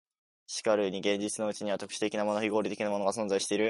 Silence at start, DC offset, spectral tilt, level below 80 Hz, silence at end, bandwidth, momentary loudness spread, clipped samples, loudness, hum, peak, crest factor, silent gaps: 0.5 s; under 0.1%; -3.5 dB/octave; -74 dBFS; 0 s; 11.5 kHz; 5 LU; under 0.1%; -31 LUFS; none; -12 dBFS; 18 dB; none